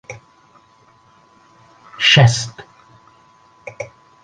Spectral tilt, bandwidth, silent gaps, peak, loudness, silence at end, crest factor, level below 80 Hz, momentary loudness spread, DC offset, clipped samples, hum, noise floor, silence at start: -4 dB/octave; 9.6 kHz; none; 0 dBFS; -13 LUFS; 0.35 s; 20 dB; -52 dBFS; 28 LU; under 0.1%; under 0.1%; none; -52 dBFS; 0.1 s